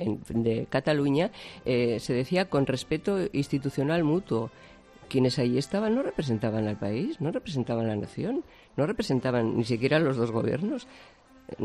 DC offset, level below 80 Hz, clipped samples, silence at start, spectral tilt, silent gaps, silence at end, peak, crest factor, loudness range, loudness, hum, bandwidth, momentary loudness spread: under 0.1%; -56 dBFS; under 0.1%; 0 s; -7 dB/octave; none; 0 s; -8 dBFS; 20 dB; 2 LU; -28 LUFS; none; 13.5 kHz; 7 LU